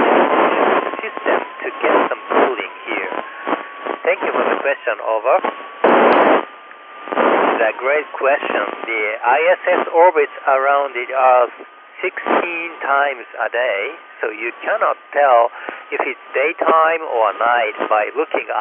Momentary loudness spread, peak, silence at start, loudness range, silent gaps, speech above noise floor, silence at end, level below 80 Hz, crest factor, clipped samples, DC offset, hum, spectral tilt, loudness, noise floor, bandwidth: 11 LU; 0 dBFS; 0 s; 4 LU; none; 21 dB; 0 s; -74 dBFS; 16 dB; under 0.1%; under 0.1%; none; -7.5 dB/octave; -17 LUFS; -38 dBFS; 5 kHz